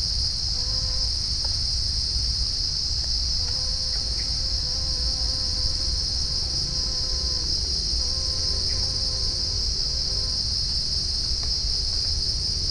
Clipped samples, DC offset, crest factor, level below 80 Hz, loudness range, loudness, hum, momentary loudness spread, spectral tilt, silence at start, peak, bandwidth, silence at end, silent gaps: under 0.1%; under 0.1%; 14 dB; -32 dBFS; 0 LU; -23 LUFS; none; 1 LU; -2 dB/octave; 0 s; -12 dBFS; 10.5 kHz; 0 s; none